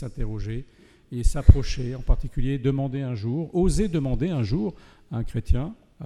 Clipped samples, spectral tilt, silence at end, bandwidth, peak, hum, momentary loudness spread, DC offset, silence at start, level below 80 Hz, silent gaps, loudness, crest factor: under 0.1%; -7.5 dB/octave; 0 s; 11.5 kHz; 0 dBFS; none; 13 LU; under 0.1%; 0 s; -26 dBFS; none; -26 LUFS; 22 dB